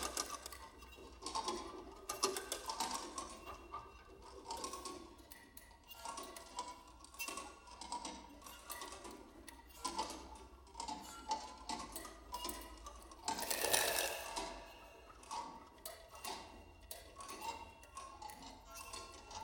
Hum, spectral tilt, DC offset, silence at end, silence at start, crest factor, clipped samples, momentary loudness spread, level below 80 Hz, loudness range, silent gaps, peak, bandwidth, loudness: none; -1 dB/octave; under 0.1%; 0 s; 0 s; 32 dB; under 0.1%; 17 LU; -64 dBFS; 10 LU; none; -16 dBFS; 19 kHz; -45 LUFS